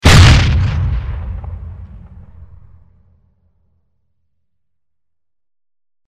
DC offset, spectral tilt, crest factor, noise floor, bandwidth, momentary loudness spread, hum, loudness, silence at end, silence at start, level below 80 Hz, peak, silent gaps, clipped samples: under 0.1%; -5 dB/octave; 16 dB; -85 dBFS; 15 kHz; 26 LU; none; -12 LUFS; 4.1 s; 0.05 s; -22 dBFS; 0 dBFS; none; 0.2%